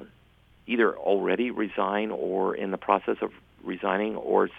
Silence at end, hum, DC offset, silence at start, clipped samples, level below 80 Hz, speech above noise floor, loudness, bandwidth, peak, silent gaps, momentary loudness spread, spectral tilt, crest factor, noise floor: 0 s; none; under 0.1%; 0 s; under 0.1%; -64 dBFS; 32 dB; -27 LUFS; 4.7 kHz; -6 dBFS; none; 7 LU; -8 dB/octave; 22 dB; -59 dBFS